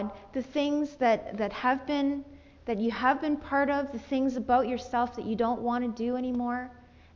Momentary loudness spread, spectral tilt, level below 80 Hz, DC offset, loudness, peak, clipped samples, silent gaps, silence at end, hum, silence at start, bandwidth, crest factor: 8 LU; -6 dB/octave; -56 dBFS; under 0.1%; -29 LUFS; -12 dBFS; under 0.1%; none; 0.35 s; none; 0 s; 7.2 kHz; 16 dB